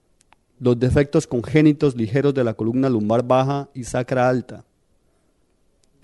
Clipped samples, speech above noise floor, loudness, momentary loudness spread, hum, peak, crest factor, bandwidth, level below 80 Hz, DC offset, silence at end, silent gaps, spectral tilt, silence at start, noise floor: under 0.1%; 45 dB; -20 LUFS; 9 LU; none; -2 dBFS; 18 dB; 11.5 kHz; -44 dBFS; under 0.1%; 1.45 s; none; -7.5 dB/octave; 0.6 s; -63 dBFS